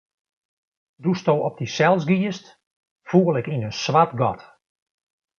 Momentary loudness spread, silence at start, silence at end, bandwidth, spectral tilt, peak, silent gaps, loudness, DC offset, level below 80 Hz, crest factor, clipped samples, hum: 9 LU; 1 s; 0.95 s; 7 kHz; -6.5 dB/octave; -2 dBFS; 2.67-2.83 s, 2.91-2.96 s; -21 LUFS; under 0.1%; -62 dBFS; 20 dB; under 0.1%; none